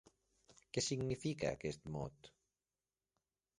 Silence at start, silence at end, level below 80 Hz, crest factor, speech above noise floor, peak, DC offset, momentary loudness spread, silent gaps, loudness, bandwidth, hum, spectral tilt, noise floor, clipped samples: 0.5 s; 1.3 s; -68 dBFS; 22 dB; over 48 dB; -24 dBFS; under 0.1%; 8 LU; none; -42 LUFS; 11.5 kHz; none; -4.5 dB/octave; under -90 dBFS; under 0.1%